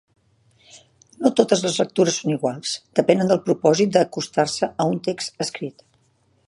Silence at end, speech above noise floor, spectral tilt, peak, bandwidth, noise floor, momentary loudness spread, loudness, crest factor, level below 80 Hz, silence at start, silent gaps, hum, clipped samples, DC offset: 0.75 s; 42 dB; -4.5 dB/octave; 0 dBFS; 11.5 kHz; -63 dBFS; 9 LU; -21 LUFS; 20 dB; -66 dBFS; 0.75 s; none; none; under 0.1%; under 0.1%